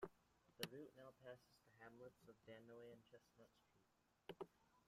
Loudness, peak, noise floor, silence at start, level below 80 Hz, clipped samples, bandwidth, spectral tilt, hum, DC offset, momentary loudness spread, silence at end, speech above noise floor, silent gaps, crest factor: -61 LUFS; -30 dBFS; -79 dBFS; 0 s; -88 dBFS; under 0.1%; 15 kHz; -4 dB/octave; none; under 0.1%; 12 LU; 0 s; 16 dB; none; 32 dB